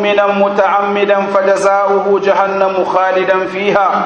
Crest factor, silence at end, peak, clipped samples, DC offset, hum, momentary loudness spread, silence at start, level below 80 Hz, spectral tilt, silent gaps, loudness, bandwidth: 12 dB; 0 s; 0 dBFS; under 0.1%; under 0.1%; none; 2 LU; 0 s; -56 dBFS; -5 dB/octave; none; -12 LUFS; 9.8 kHz